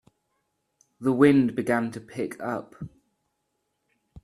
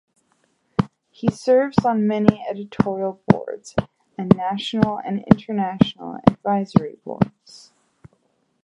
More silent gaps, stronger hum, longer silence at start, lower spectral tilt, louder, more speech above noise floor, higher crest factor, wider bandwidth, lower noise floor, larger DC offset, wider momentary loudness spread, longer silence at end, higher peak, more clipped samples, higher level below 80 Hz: neither; neither; first, 1 s vs 0.8 s; about the same, -7.5 dB/octave vs -8 dB/octave; second, -25 LUFS vs -21 LUFS; first, 53 dB vs 46 dB; about the same, 22 dB vs 22 dB; first, 12.5 kHz vs 10.5 kHz; first, -77 dBFS vs -66 dBFS; neither; first, 23 LU vs 10 LU; second, 0.05 s vs 1.05 s; second, -4 dBFS vs 0 dBFS; neither; second, -62 dBFS vs -48 dBFS